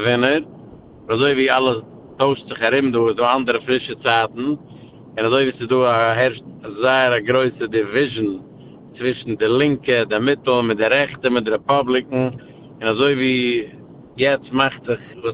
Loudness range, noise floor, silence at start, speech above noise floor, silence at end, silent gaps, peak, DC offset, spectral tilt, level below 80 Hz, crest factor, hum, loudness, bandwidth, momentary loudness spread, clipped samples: 2 LU; -41 dBFS; 0 s; 23 dB; 0 s; none; -2 dBFS; under 0.1%; -9.5 dB/octave; -54 dBFS; 18 dB; none; -18 LUFS; 4 kHz; 9 LU; under 0.1%